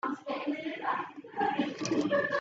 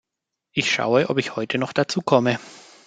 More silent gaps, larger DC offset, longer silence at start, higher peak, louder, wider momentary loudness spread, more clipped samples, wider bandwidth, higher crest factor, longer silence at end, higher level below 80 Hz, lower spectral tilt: neither; neither; second, 0.05 s vs 0.55 s; second, -16 dBFS vs -2 dBFS; second, -33 LUFS vs -22 LUFS; about the same, 7 LU vs 6 LU; neither; second, 8 kHz vs 9.4 kHz; about the same, 16 dB vs 20 dB; second, 0 s vs 0.25 s; second, -76 dBFS vs -64 dBFS; about the same, -4.5 dB/octave vs -4.5 dB/octave